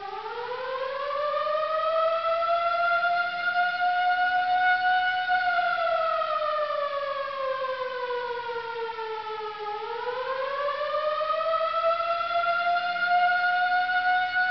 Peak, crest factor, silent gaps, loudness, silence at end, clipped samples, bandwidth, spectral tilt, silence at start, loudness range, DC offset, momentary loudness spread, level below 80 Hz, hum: -14 dBFS; 12 dB; none; -26 LUFS; 0 s; under 0.1%; 6.2 kHz; 2.5 dB/octave; 0 s; 7 LU; 0.1%; 9 LU; -68 dBFS; none